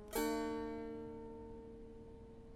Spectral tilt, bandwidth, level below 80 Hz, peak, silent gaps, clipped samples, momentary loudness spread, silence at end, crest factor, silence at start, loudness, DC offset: -4.5 dB/octave; 16 kHz; -60 dBFS; -24 dBFS; none; under 0.1%; 17 LU; 0 s; 20 dB; 0 s; -44 LUFS; under 0.1%